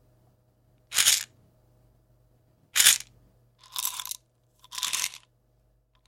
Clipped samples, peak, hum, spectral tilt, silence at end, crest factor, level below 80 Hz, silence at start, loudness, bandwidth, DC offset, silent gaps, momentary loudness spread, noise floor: under 0.1%; 0 dBFS; none; 3.5 dB/octave; 0.9 s; 30 dB; -68 dBFS; 0.9 s; -24 LUFS; 17 kHz; under 0.1%; none; 21 LU; -67 dBFS